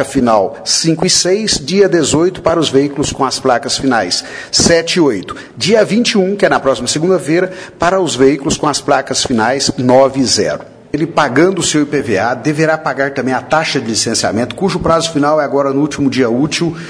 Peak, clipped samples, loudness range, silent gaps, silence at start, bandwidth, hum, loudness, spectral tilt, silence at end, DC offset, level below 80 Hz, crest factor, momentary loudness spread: 0 dBFS; under 0.1%; 2 LU; none; 0 s; 11 kHz; none; -12 LUFS; -3.5 dB/octave; 0 s; under 0.1%; -42 dBFS; 12 dB; 6 LU